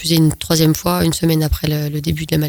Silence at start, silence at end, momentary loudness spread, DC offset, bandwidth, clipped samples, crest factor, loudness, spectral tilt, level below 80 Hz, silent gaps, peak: 0 s; 0 s; 5 LU; under 0.1%; over 20 kHz; under 0.1%; 14 dB; -16 LUFS; -5.5 dB/octave; -30 dBFS; none; -2 dBFS